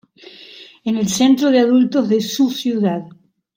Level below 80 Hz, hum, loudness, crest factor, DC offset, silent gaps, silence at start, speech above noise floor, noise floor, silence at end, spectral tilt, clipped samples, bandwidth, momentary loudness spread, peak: -62 dBFS; none; -16 LUFS; 14 dB; under 0.1%; none; 0.4 s; 26 dB; -42 dBFS; 0.45 s; -5 dB/octave; under 0.1%; 16.5 kHz; 14 LU; -2 dBFS